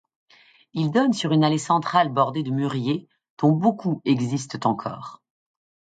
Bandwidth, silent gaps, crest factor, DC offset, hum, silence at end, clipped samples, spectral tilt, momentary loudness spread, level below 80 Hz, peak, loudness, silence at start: 9.2 kHz; 3.30-3.37 s; 18 dB; under 0.1%; none; 0.75 s; under 0.1%; -6.5 dB/octave; 10 LU; -68 dBFS; -6 dBFS; -23 LUFS; 0.75 s